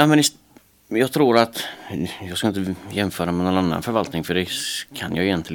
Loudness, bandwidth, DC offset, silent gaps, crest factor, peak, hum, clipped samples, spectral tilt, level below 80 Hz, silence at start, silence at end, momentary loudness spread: -22 LUFS; 19 kHz; under 0.1%; none; 20 dB; 0 dBFS; none; under 0.1%; -4.5 dB/octave; -52 dBFS; 0 s; 0 s; 11 LU